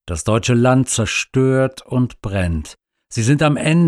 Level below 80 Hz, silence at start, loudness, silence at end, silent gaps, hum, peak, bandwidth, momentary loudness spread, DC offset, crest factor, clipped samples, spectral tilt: -40 dBFS; 0.05 s; -17 LUFS; 0 s; none; none; -4 dBFS; 13 kHz; 8 LU; under 0.1%; 14 dB; under 0.1%; -5.5 dB/octave